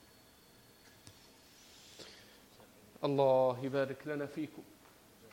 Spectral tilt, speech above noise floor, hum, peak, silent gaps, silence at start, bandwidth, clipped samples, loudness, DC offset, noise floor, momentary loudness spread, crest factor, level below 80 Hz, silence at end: -6.5 dB/octave; 29 dB; none; -18 dBFS; none; 1.05 s; 16.5 kHz; under 0.1%; -34 LUFS; under 0.1%; -62 dBFS; 28 LU; 22 dB; -76 dBFS; 0.7 s